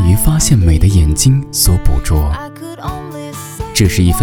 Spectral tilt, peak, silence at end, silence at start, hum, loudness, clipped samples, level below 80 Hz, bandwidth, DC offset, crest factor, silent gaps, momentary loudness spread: -5 dB/octave; 0 dBFS; 0 s; 0 s; none; -12 LUFS; 0.2%; -18 dBFS; 18 kHz; under 0.1%; 12 dB; none; 15 LU